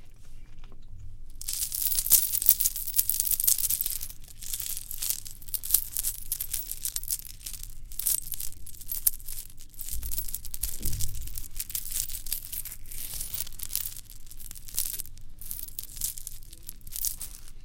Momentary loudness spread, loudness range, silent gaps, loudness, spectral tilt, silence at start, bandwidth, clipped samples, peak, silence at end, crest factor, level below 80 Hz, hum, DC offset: 18 LU; 11 LU; none; -28 LUFS; 0 dB/octave; 0 s; 17.5 kHz; under 0.1%; 0 dBFS; 0 s; 30 dB; -40 dBFS; none; under 0.1%